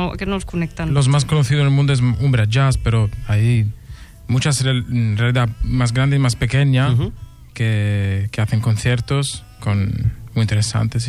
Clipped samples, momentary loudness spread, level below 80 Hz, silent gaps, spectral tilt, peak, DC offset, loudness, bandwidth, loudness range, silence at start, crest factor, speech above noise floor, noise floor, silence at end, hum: under 0.1%; 7 LU; -34 dBFS; none; -6 dB/octave; -4 dBFS; under 0.1%; -18 LUFS; 12.5 kHz; 3 LU; 0 s; 12 dB; 20 dB; -37 dBFS; 0 s; none